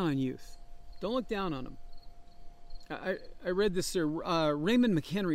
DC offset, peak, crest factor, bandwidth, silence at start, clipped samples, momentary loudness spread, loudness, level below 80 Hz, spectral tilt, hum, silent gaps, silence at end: under 0.1%; -18 dBFS; 16 dB; 16 kHz; 0 s; under 0.1%; 14 LU; -32 LUFS; -50 dBFS; -5.5 dB/octave; none; none; 0 s